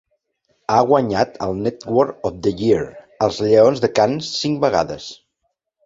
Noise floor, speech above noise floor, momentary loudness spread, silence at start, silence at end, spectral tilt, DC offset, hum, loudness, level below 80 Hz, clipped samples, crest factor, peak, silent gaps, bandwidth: -73 dBFS; 56 dB; 11 LU; 0.7 s; 0.7 s; -5.5 dB/octave; under 0.1%; none; -18 LUFS; -50 dBFS; under 0.1%; 18 dB; -2 dBFS; none; 7.8 kHz